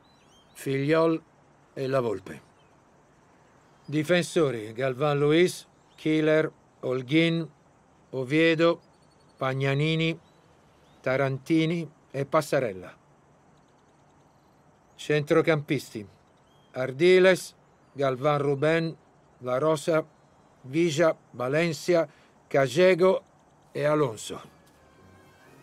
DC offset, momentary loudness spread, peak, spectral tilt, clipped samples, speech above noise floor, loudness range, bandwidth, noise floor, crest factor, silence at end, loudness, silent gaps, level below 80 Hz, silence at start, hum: under 0.1%; 16 LU; -8 dBFS; -6 dB/octave; under 0.1%; 35 dB; 5 LU; 15 kHz; -60 dBFS; 20 dB; 1.15 s; -26 LUFS; none; -72 dBFS; 0.55 s; none